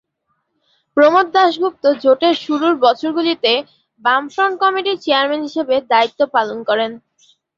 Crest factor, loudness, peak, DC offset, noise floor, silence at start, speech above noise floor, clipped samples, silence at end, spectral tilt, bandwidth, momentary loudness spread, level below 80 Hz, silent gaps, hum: 16 dB; -16 LUFS; -2 dBFS; under 0.1%; -69 dBFS; 0.95 s; 54 dB; under 0.1%; 0.6 s; -4 dB/octave; 7.4 kHz; 7 LU; -66 dBFS; none; none